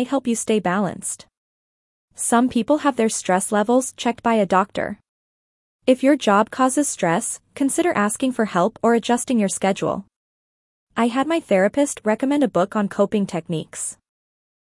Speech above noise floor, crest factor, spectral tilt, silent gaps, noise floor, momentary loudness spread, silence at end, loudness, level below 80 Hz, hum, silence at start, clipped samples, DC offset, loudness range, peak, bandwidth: over 70 dB; 18 dB; -4.5 dB/octave; 1.37-2.08 s, 5.09-5.79 s, 10.16-10.87 s; under -90 dBFS; 10 LU; 0.8 s; -20 LUFS; -62 dBFS; none; 0 s; under 0.1%; under 0.1%; 2 LU; -4 dBFS; 12 kHz